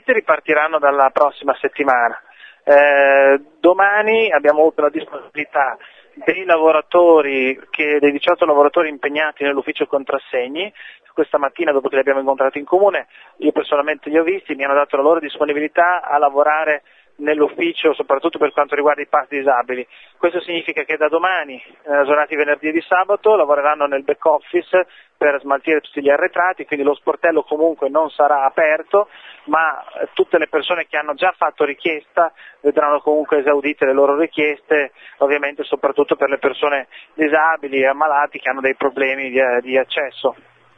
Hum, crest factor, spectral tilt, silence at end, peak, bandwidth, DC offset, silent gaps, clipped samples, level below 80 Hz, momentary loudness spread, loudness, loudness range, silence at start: none; 16 dB; -6 dB/octave; 0.45 s; 0 dBFS; 5.6 kHz; under 0.1%; none; under 0.1%; -68 dBFS; 8 LU; -16 LUFS; 4 LU; 0.1 s